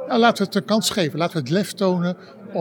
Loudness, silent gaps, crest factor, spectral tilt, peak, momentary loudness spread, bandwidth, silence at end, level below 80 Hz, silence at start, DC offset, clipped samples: -21 LUFS; none; 18 dB; -5 dB/octave; -2 dBFS; 9 LU; 19 kHz; 0 s; -64 dBFS; 0 s; under 0.1%; under 0.1%